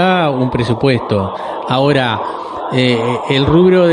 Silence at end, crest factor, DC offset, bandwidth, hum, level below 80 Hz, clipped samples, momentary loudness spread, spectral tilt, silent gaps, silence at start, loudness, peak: 0 s; 12 dB; under 0.1%; 10.5 kHz; none; -40 dBFS; under 0.1%; 10 LU; -7 dB/octave; none; 0 s; -14 LUFS; 0 dBFS